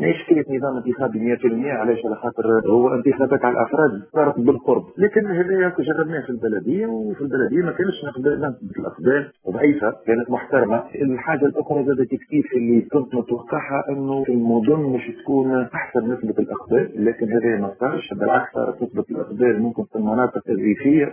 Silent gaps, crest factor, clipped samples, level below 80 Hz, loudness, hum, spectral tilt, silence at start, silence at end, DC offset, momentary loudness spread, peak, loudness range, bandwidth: none; 18 dB; under 0.1%; -58 dBFS; -20 LUFS; none; -11.5 dB/octave; 0 s; 0 s; under 0.1%; 6 LU; -2 dBFS; 3 LU; 3.5 kHz